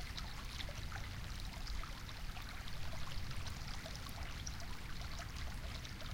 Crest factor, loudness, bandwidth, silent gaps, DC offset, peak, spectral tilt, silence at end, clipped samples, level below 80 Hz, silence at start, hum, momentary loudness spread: 18 dB; -47 LUFS; 17 kHz; none; under 0.1%; -26 dBFS; -3.5 dB/octave; 0 s; under 0.1%; -48 dBFS; 0 s; none; 2 LU